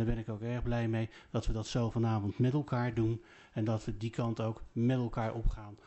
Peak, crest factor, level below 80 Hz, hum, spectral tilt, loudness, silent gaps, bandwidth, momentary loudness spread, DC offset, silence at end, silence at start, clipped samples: -18 dBFS; 14 dB; -42 dBFS; none; -7.5 dB/octave; -35 LUFS; none; 8.2 kHz; 7 LU; under 0.1%; 0.1 s; 0 s; under 0.1%